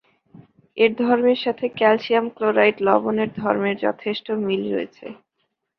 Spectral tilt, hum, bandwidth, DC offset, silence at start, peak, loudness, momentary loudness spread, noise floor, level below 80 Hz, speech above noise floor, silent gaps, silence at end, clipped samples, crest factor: -7.5 dB/octave; none; 6 kHz; under 0.1%; 0.75 s; -2 dBFS; -20 LUFS; 10 LU; -74 dBFS; -64 dBFS; 54 dB; none; 0.65 s; under 0.1%; 18 dB